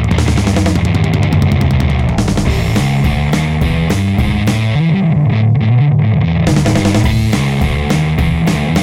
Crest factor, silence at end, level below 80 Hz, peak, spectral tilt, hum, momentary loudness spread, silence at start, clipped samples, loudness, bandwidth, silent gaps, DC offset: 8 dB; 0 s; -22 dBFS; -2 dBFS; -6.5 dB/octave; none; 3 LU; 0 s; under 0.1%; -13 LUFS; 16 kHz; none; under 0.1%